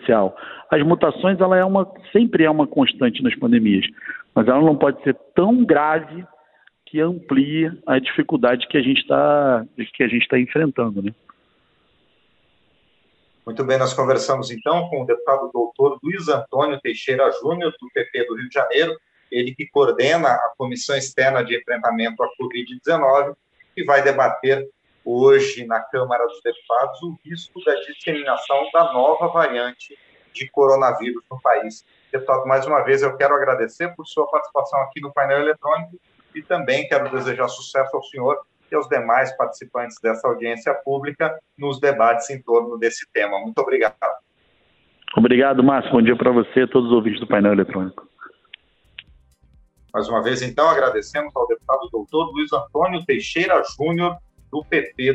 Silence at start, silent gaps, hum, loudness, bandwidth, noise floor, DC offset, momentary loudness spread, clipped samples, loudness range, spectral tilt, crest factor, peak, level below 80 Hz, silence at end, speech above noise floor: 0 s; none; none; -19 LUFS; 8.4 kHz; -62 dBFS; under 0.1%; 11 LU; under 0.1%; 5 LU; -5.5 dB/octave; 18 dB; -2 dBFS; -60 dBFS; 0 s; 43 dB